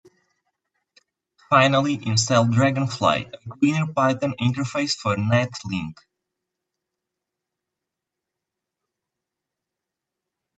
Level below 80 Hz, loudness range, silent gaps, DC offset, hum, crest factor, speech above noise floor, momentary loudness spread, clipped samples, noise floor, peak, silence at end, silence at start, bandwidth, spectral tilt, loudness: -62 dBFS; 9 LU; none; under 0.1%; none; 22 dB; 64 dB; 10 LU; under 0.1%; -85 dBFS; -2 dBFS; 4.65 s; 1.5 s; 8.6 kHz; -5 dB/octave; -21 LUFS